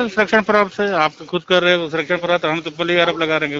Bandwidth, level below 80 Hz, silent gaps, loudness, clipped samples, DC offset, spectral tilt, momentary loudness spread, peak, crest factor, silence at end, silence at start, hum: 7.8 kHz; -56 dBFS; none; -17 LUFS; under 0.1%; under 0.1%; -5 dB/octave; 6 LU; 0 dBFS; 18 dB; 0 s; 0 s; none